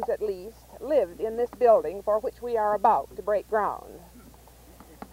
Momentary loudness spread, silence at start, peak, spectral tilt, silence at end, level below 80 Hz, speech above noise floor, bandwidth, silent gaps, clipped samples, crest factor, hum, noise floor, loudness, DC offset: 19 LU; 0 s; -8 dBFS; -6 dB/octave; 0.05 s; -54 dBFS; 26 dB; 16 kHz; none; under 0.1%; 18 dB; none; -51 dBFS; -26 LUFS; under 0.1%